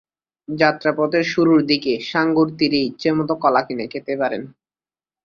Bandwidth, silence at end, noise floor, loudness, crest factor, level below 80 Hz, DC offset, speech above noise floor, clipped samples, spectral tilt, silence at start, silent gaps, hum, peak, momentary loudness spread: 7 kHz; 0.75 s; under -90 dBFS; -19 LUFS; 18 dB; -60 dBFS; under 0.1%; over 71 dB; under 0.1%; -6 dB/octave; 0.5 s; none; none; -2 dBFS; 10 LU